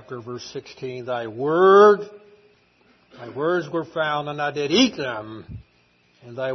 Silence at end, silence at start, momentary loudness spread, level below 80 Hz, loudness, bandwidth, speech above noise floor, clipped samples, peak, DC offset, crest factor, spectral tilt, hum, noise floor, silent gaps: 0 s; 0.1 s; 24 LU; -60 dBFS; -20 LUFS; 6.4 kHz; 40 dB; under 0.1%; -2 dBFS; under 0.1%; 20 dB; -5 dB/octave; none; -61 dBFS; none